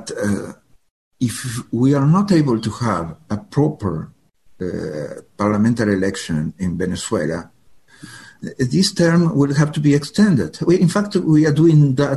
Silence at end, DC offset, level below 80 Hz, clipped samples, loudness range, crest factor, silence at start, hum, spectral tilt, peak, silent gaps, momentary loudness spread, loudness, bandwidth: 0 s; 0.1%; -46 dBFS; under 0.1%; 6 LU; 14 dB; 0 s; none; -6.5 dB/octave; -4 dBFS; 0.91-1.11 s; 14 LU; -18 LUFS; 12.5 kHz